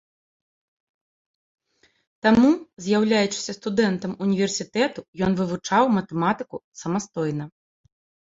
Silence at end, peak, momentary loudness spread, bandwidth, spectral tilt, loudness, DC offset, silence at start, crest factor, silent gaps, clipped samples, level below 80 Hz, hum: 0.8 s; -4 dBFS; 9 LU; 7.8 kHz; -5 dB/octave; -23 LUFS; under 0.1%; 2.25 s; 20 dB; 2.73-2.77 s, 5.08-5.13 s, 6.64-6.72 s; under 0.1%; -58 dBFS; none